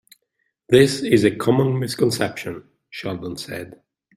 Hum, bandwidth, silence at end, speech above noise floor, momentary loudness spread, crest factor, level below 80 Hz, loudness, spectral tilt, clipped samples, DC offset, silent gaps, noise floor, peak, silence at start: none; 15.5 kHz; 0.5 s; 54 dB; 18 LU; 20 dB; -56 dBFS; -19 LUFS; -5.5 dB/octave; under 0.1%; under 0.1%; none; -73 dBFS; -2 dBFS; 0.7 s